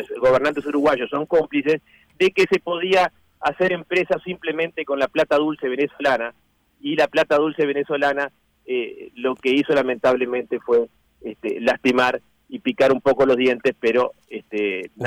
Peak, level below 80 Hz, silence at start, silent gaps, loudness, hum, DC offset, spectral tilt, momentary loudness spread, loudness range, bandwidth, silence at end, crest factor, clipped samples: -8 dBFS; -58 dBFS; 0 s; none; -21 LUFS; none; under 0.1%; -5.5 dB/octave; 10 LU; 2 LU; 13.5 kHz; 0 s; 12 dB; under 0.1%